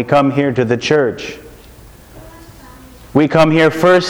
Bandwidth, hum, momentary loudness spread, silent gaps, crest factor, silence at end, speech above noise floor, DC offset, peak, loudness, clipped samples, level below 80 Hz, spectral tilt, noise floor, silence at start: over 20 kHz; none; 15 LU; none; 14 dB; 0 s; 27 dB; under 0.1%; 0 dBFS; -13 LUFS; under 0.1%; -44 dBFS; -6 dB/octave; -39 dBFS; 0 s